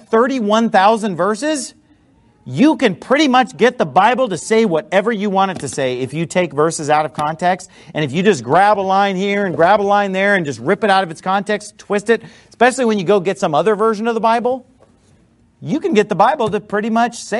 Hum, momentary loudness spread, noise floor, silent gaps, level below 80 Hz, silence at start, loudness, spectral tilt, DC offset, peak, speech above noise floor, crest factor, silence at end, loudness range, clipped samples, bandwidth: none; 8 LU; -53 dBFS; none; -58 dBFS; 0.1 s; -15 LUFS; -5 dB/octave; under 0.1%; 0 dBFS; 37 dB; 16 dB; 0 s; 3 LU; under 0.1%; 11.5 kHz